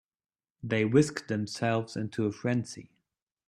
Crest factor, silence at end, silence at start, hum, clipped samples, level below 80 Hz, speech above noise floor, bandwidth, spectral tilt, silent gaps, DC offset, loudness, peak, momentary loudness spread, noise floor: 20 dB; 0.65 s; 0.65 s; none; under 0.1%; -68 dBFS; over 61 dB; 13 kHz; -6 dB/octave; none; under 0.1%; -30 LUFS; -10 dBFS; 14 LU; under -90 dBFS